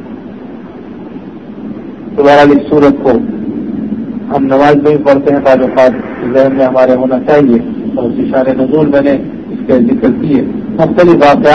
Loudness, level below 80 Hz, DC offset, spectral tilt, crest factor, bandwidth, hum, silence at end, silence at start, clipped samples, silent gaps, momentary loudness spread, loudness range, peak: -9 LUFS; -40 dBFS; 0.5%; -8 dB/octave; 10 dB; 7.2 kHz; none; 0 s; 0 s; 2%; none; 20 LU; 2 LU; 0 dBFS